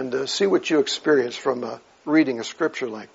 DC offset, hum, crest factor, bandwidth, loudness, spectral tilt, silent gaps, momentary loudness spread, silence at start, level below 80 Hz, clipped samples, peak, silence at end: under 0.1%; none; 16 dB; 8 kHz; -22 LUFS; -3 dB/octave; none; 10 LU; 0 s; -72 dBFS; under 0.1%; -6 dBFS; 0.1 s